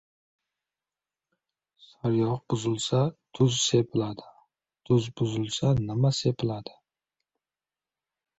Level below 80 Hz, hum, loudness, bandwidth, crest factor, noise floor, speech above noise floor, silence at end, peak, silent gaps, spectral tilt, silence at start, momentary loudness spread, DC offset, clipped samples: -58 dBFS; none; -27 LUFS; 8.2 kHz; 20 dB; under -90 dBFS; over 64 dB; 1.75 s; -10 dBFS; none; -5.5 dB/octave; 2.05 s; 9 LU; under 0.1%; under 0.1%